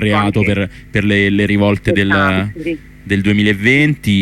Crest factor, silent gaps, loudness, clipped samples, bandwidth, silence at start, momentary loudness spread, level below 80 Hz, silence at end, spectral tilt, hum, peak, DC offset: 12 dB; none; -14 LUFS; under 0.1%; 13.5 kHz; 0 s; 8 LU; -38 dBFS; 0 s; -6.5 dB/octave; none; 0 dBFS; under 0.1%